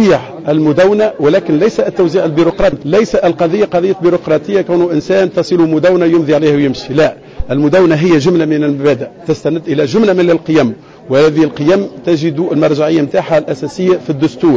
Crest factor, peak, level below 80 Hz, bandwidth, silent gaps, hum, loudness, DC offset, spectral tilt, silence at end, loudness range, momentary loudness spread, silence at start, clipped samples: 10 dB; -2 dBFS; -38 dBFS; 7.8 kHz; none; none; -11 LUFS; 0.2%; -7 dB/octave; 0 s; 1 LU; 6 LU; 0 s; under 0.1%